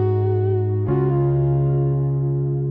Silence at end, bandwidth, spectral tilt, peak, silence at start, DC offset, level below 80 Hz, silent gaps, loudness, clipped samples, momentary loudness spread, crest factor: 0 s; 3 kHz; -13.5 dB/octave; -8 dBFS; 0 s; under 0.1%; -40 dBFS; none; -20 LUFS; under 0.1%; 3 LU; 10 dB